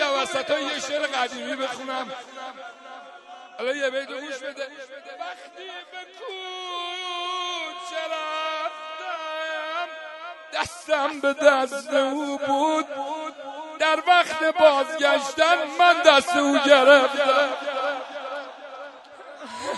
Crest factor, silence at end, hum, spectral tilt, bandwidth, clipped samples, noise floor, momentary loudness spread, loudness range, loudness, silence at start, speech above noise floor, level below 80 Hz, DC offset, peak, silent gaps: 24 dB; 0 s; none; -1.5 dB/octave; 11.5 kHz; under 0.1%; -44 dBFS; 21 LU; 14 LU; -22 LUFS; 0 s; 21 dB; -72 dBFS; under 0.1%; 0 dBFS; none